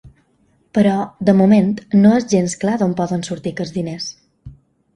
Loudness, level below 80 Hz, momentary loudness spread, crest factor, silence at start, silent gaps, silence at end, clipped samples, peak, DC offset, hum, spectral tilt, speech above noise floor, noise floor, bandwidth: -16 LUFS; -52 dBFS; 12 LU; 16 dB; 0.05 s; none; 0.45 s; under 0.1%; 0 dBFS; under 0.1%; none; -6.5 dB/octave; 44 dB; -59 dBFS; 10.5 kHz